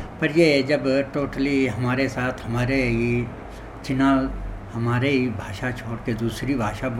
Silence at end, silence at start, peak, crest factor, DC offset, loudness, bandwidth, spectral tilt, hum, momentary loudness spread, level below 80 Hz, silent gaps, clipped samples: 0 s; 0 s; -4 dBFS; 18 dB; under 0.1%; -23 LUFS; 15 kHz; -6.5 dB/octave; none; 11 LU; -40 dBFS; none; under 0.1%